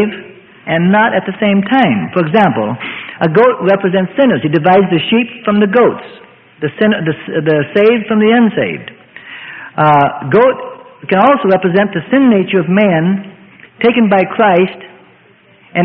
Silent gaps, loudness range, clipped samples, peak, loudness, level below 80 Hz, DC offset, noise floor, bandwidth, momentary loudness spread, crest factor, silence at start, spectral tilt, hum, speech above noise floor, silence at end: none; 2 LU; under 0.1%; 0 dBFS; -11 LUFS; -54 dBFS; under 0.1%; -46 dBFS; 4.9 kHz; 13 LU; 12 dB; 0 s; -9.5 dB/octave; none; 35 dB; 0 s